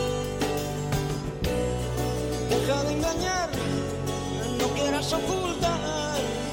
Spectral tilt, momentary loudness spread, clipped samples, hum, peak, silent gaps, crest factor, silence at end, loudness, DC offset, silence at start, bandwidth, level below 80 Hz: -4.5 dB/octave; 4 LU; under 0.1%; none; -14 dBFS; none; 14 dB; 0 s; -28 LUFS; under 0.1%; 0 s; 17 kHz; -40 dBFS